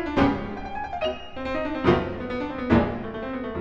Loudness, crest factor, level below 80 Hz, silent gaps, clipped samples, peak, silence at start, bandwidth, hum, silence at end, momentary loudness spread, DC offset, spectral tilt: -26 LUFS; 20 dB; -40 dBFS; none; under 0.1%; -6 dBFS; 0 s; 7.4 kHz; none; 0 s; 10 LU; under 0.1%; -8 dB/octave